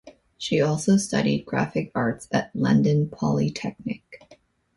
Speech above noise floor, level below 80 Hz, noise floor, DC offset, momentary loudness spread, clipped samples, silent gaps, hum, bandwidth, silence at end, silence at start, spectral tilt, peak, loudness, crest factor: 33 dB; -56 dBFS; -56 dBFS; under 0.1%; 12 LU; under 0.1%; none; none; 11.5 kHz; 0.6 s; 0.05 s; -6 dB/octave; -8 dBFS; -24 LUFS; 16 dB